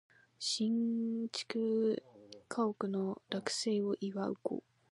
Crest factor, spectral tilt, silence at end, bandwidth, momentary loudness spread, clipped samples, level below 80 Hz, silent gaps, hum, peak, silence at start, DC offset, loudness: 16 dB; -4.5 dB/octave; 0.35 s; 11.5 kHz; 9 LU; under 0.1%; -84 dBFS; none; none; -20 dBFS; 0.4 s; under 0.1%; -36 LUFS